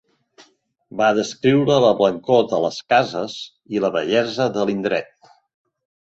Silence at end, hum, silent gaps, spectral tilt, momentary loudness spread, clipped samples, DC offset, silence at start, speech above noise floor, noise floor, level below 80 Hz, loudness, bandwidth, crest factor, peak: 1.1 s; none; none; -5.5 dB/octave; 11 LU; under 0.1%; under 0.1%; 0.95 s; 38 dB; -57 dBFS; -60 dBFS; -19 LUFS; 8 kHz; 18 dB; -2 dBFS